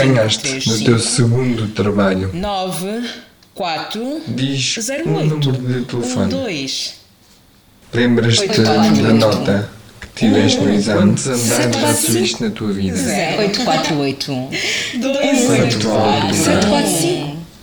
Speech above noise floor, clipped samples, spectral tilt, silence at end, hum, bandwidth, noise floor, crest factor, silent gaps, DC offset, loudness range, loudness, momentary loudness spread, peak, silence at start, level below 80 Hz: 33 dB; under 0.1%; -4.5 dB/octave; 0.05 s; none; over 20 kHz; -48 dBFS; 16 dB; none; under 0.1%; 6 LU; -16 LUFS; 9 LU; 0 dBFS; 0 s; -46 dBFS